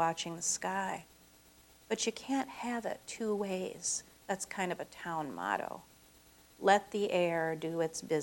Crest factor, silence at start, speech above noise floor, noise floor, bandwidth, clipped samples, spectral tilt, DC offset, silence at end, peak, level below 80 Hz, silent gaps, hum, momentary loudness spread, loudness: 22 dB; 0 s; 27 dB; -62 dBFS; over 20 kHz; under 0.1%; -3 dB/octave; under 0.1%; 0 s; -12 dBFS; -70 dBFS; none; none; 10 LU; -35 LUFS